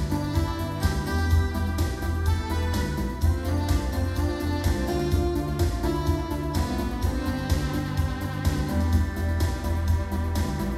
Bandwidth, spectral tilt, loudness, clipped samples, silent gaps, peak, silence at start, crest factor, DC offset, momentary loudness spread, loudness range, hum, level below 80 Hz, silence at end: 15 kHz; -6.5 dB/octave; -27 LUFS; under 0.1%; none; -10 dBFS; 0 s; 16 dB; under 0.1%; 3 LU; 1 LU; none; -30 dBFS; 0 s